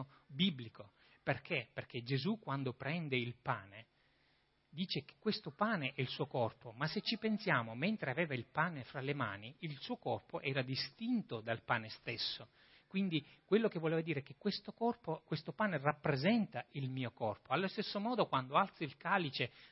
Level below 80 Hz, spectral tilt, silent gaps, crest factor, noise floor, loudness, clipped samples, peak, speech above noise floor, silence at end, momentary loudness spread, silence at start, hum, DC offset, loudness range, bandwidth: -78 dBFS; -4 dB/octave; none; 22 dB; -75 dBFS; -39 LUFS; under 0.1%; -16 dBFS; 37 dB; 0.05 s; 9 LU; 0 s; none; under 0.1%; 4 LU; 5.8 kHz